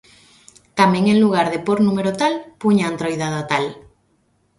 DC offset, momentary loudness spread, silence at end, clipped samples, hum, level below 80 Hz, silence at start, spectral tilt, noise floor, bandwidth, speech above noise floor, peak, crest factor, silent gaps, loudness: under 0.1%; 8 LU; 0.8 s; under 0.1%; none; -58 dBFS; 0.75 s; -6 dB/octave; -62 dBFS; 11.5 kHz; 45 dB; 0 dBFS; 18 dB; none; -18 LUFS